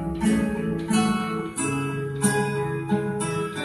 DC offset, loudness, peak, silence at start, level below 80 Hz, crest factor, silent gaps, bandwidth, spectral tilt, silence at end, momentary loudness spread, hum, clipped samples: under 0.1%; -25 LUFS; -8 dBFS; 0 s; -46 dBFS; 16 dB; none; 12.5 kHz; -5 dB/octave; 0 s; 5 LU; none; under 0.1%